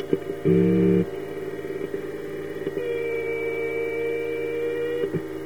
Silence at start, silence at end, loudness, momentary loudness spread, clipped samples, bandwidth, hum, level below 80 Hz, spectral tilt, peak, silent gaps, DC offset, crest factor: 0 s; 0 s; -26 LUFS; 12 LU; under 0.1%; 16.5 kHz; none; -58 dBFS; -8 dB/octave; -6 dBFS; none; 0.6%; 20 dB